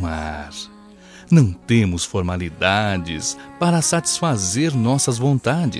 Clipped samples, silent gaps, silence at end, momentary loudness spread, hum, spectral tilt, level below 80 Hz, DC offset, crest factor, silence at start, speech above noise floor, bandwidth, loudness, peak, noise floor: under 0.1%; none; 0 s; 11 LU; none; -4.5 dB/octave; -42 dBFS; under 0.1%; 18 dB; 0 s; 25 dB; 13.5 kHz; -19 LUFS; -2 dBFS; -43 dBFS